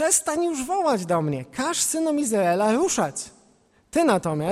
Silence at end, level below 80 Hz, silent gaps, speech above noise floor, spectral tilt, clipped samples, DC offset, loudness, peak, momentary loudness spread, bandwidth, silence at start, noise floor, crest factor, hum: 0 s; -58 dBFS; none; 37 dB; -4 dB/octave; under 0.1%; under 0.1%; -23 LUFS; -4 dBFS; 7 LU; 16 kHz; 0 s; -60 dBFS; 18 dB; none